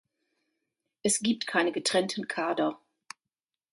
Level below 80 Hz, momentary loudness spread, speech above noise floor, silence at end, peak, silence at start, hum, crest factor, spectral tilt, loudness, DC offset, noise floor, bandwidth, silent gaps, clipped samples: -74 dBFS; 22 LU; 61 dB; 0.95 s; -10 dBFS; 1.05 s; none; 20 dB; -2.5 dB/octave; -28 LUFS; under 0.1%; -90 dBFS; 11.5 kHz; none; under 0.1%